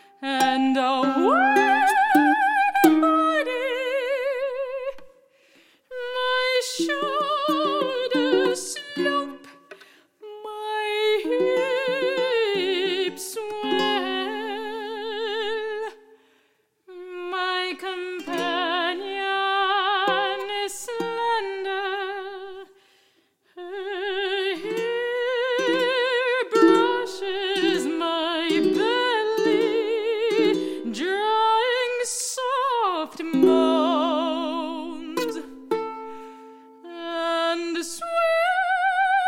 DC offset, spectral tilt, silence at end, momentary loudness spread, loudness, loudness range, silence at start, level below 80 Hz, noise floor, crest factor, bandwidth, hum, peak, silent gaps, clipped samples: under 0.1%; -2.5 dB/octave; 0 s; 13 LU; -23 LUFS; 9 LU; 0.2 s; -72 dBFS; -66 dBFS; 22 dB; 16.5 kHz; none; -2 dBFS; none; under 0.1%